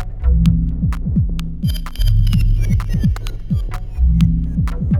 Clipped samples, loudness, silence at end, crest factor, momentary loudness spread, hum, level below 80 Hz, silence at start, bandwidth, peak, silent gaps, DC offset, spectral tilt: under 0.1%; -18 LUFS; 0 s; 14 dB; 7 LU; none; -18 dBFS; 0 s; 14.5 kHz; -2 dBFS; none; under 0.1%; -7.5 dB/octave